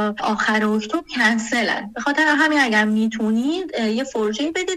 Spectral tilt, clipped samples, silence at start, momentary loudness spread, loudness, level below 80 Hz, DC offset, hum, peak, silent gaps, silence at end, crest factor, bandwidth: -4 dB/octave; under 0.1%; 0 s; 7 LU; -19 LUFS; -56 dBFS; under 0.1%; none; -4 dBFS; none; 0 s; 16 dB; 12.5 kHz